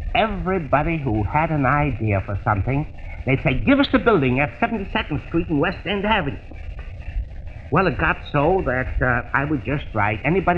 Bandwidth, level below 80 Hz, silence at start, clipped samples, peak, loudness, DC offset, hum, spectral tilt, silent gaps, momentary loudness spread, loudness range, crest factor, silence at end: 5.8 kHz; -32 dBFS; 0 s; under 0.1%; -4 dBFS; -21 LUFS; 0.2%; none; -9 dB/octave; none; 14 LU; 3 LU; 18 dB; 0 s